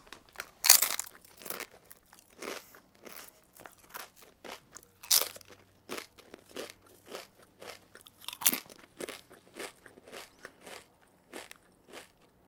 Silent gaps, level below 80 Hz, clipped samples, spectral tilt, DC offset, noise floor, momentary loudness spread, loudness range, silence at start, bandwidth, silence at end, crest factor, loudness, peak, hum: none; -74 dBFS; under 0.1%; 1 dB/octave; under 0.1%; -64 dBFS; 25 LU; 18 LU; 0.1 s; 18 kHz; 0.45 s; 36 dB; -28 LUFS; 0 dBFS; none